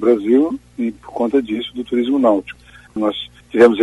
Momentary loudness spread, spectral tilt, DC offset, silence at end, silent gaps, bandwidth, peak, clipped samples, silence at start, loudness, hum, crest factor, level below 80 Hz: 13 LU; -6 dB/octave; under 0.1%; 0 s; none; 11.5 kHz; 0 dBFS; under 0.1%; 0 s; -18 LUFS; none; 16 dB; -52 dBFS